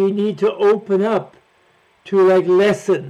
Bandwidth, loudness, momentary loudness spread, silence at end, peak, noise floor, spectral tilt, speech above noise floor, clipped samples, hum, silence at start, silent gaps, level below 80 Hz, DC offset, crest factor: 10 kHz; -16 LUFS; 7 LU; 0 s; -6 dBFS; -56 dBFS; -6.5 dB/octave; 41 dB; under 0.1%; none; 0 s; none; -62 dBFS; under 0.1%; 10 dB